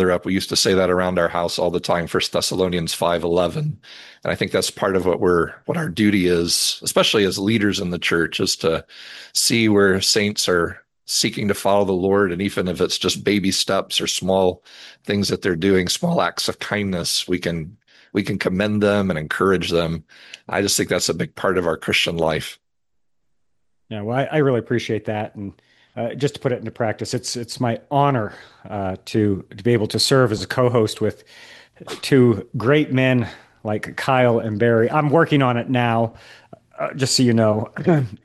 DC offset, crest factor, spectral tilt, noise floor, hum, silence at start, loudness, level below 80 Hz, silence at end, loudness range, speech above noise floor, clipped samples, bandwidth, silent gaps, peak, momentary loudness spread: under 0.1%; 18 dB; -4.5 dB/octave; -78 dBFS; none; 0 s; -20 LUFS; -54 dBFS; 0.1 s; 5 LU; 58 dB; under 0.1%; 12.5 kHz; none; -2 dBFS; 10 LU